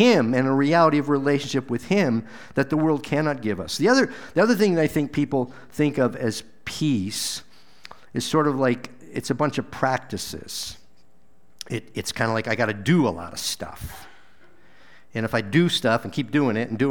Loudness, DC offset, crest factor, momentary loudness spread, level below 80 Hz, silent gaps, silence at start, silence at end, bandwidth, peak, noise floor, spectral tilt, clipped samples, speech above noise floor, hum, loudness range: -23 LUFS; 0.6%; 18 dB; 13 LU; -54 dBFS; none; 0 s; 0 s; over 20 kHz; -4 dBFS; -62 dBFS; -5.5 dB/octave; under 0.1%; 40 dB; none; 5 LU